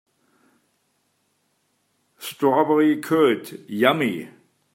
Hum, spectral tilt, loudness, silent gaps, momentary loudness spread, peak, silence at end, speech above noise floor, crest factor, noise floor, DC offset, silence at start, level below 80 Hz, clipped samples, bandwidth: none; -5.5 dB/octave; -20 LUFS; none; 17 LU; -2 dBFS; 0.45 s; 49 dB; 22 dB; -69 dBFS; under 0.1%; 2.2 s; -74 dBFS; under 0.1%; 16.5 kHz